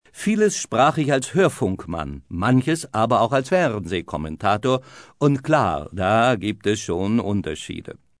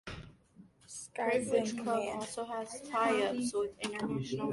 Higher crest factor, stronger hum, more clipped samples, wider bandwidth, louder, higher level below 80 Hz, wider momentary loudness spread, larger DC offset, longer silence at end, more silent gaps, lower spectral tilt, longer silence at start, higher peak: about the same, 16 dB vs 18 dB; neither; neither; about the same, 11 kHz vs 11.5 kHz; first, -21 LUFS vs -34 LUFS; first, -48 dBFS vs -64 dBFS; second, 11 LU vs 14 LU; neither; first, 0.25 s vs 0 s; neither; about the same, -5.5 dB/octave vs -4.5 dB/octave; about the same, 0.15 s vs 0.05 s; first, -6 dBFS vs -18 dBFS